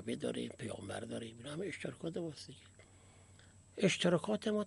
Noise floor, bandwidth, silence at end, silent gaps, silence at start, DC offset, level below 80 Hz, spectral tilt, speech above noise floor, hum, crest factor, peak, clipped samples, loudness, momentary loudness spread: -61 dBFS; 11.5 kHz; 0 s; none; 0 s; under 0.1%; -72 dBFS; -5 dB/octave; 23 dB; none; 22 dB; -18 dBFS; under 0.1%; -38 LUFS; 16 LU